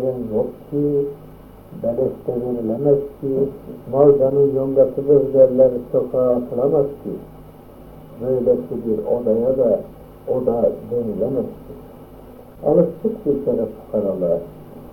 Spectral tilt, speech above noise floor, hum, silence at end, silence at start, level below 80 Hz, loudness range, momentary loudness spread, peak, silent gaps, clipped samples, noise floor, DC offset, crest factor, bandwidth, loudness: -11 dB/octave; 22 dB; none; 0 s; 0 s; -48 dBFS; 6 LU; 16 LU; -2 dBFS; none; under 0.1%; -41 dBFS; under 0.1%; 18 dB; 16.5 kHz; -19 LUFS